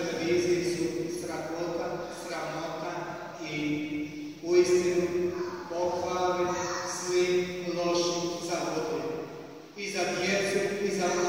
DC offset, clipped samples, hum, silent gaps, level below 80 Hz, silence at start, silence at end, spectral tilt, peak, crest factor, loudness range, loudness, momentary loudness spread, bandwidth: under 0.1%; under 0.1%; none; none; -64 dBFS; 0 s; 0 s; -4 dB/octave; -12 dBFS; 18 dB; 5 LU; -30 LUFS; 10 LU; 16 kHz